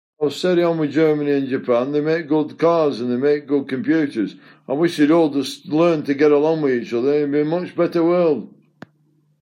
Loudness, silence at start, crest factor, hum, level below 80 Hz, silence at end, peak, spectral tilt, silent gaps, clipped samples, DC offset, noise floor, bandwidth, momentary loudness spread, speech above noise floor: -19 LUFS; 0.2 s; 14 dB; none; -70 dBFS; 0.95 s; -4 dBFS; -7 dB/octave; none; under 0.1%; under 0.1%; -61 dBFS; 13.5 kHz; 6 LU; 43 dB